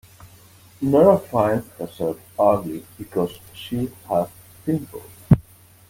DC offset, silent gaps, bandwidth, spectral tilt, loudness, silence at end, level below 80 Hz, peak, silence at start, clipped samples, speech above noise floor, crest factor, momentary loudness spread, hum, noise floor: under 0.1%; none; 17 kHz; -8 dB/octave; -22 LUFS; 0.5 s; -46 dBFS; -2 dBFS; 0.8 s; under 0.1%; 28 dB; 20 dB; 17 LU; none; -49 dBFS